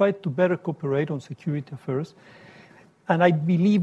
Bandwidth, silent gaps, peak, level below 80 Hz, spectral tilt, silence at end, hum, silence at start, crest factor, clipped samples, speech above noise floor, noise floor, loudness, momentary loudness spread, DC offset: 8.2 kHz; none; -6 dBFS; -68 dBFS; -8.5 dB/octave; 0 s; none; 0 s; 18 dB; under 0.1%; 29 dB; -52 dBFS; -24 LUFS; 11 LU; under 0.1%